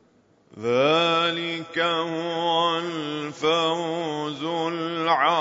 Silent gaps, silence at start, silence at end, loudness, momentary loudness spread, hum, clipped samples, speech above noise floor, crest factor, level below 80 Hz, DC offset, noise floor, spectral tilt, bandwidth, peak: none; 0.55 s; 0 s; -24 LUFS; 9 LU; none; under 0.1%; 37 dB; 18 dB; -74 dBFS; under 0.1%; -60 dBFS; -4.5 dB/octave; 7.8 kHz; -6 dBFS